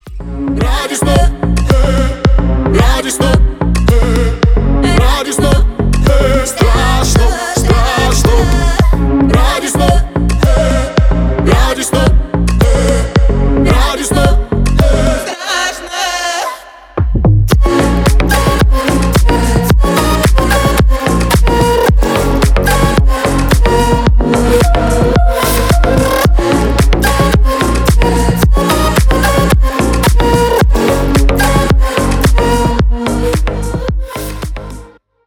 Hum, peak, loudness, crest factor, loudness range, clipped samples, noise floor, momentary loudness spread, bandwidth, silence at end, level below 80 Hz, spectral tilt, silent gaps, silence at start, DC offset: none; 0 dBFS; -11 LUFS; 10 dB; 2 LU; under 0.1%; -35 dBFS; 4 LU; 17.5 kHz; 0.45 s; -12 dBFS; -5.5 dB/octave; none; 0.05 s; under 0.1%